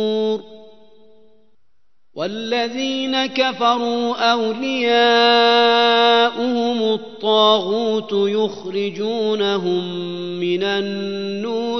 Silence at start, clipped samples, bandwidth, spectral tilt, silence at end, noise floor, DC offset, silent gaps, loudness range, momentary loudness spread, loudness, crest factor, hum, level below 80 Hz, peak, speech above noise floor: 0 s; under 0.1%; 6.2 kHz; -4.5 dB/octave; 0 s; -72 dBFS; 0.4%; none; 7 LU; 12 LU; -18 LUFS; 16 dB; none; -66 dBFS; -2 dBFS; 54 dB